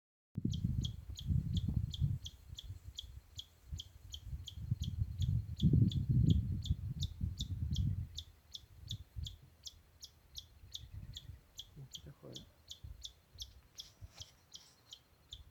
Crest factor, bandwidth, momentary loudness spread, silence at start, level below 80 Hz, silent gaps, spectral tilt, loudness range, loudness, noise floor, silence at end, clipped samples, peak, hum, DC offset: 22 dB; 19 kHz; 20 LU; 0.35 s; -48 dBFS; none; -6.5 dB/octave; 16 LU; -40 LUFS; -61 dBFS; 0.1 s; under 0.1%; -18 dBFS; none; under 0.1%